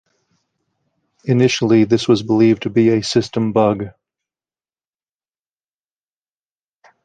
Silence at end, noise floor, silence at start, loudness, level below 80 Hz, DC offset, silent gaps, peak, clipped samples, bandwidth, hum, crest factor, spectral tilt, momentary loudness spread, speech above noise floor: 3.15 s; under -90 dBFS; 1.25 s; -15 LUFS; -56 dBFS; under 0.1%; none; -2 dBFS; under 0.1%; 9.2 kHz; none; 16 dB; -6 dB/octave; 6 LU; over 75 dB